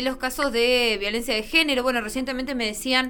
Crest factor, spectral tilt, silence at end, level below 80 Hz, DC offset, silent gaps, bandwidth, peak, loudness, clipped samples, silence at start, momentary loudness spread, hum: 18 dB; -2 dB/octave; 0 s; -44 dBFS; under 0.1%; none; 20 kHz; -6 dBFS; -22 LUFS; under 0.1%; 0 s; 8 LU; none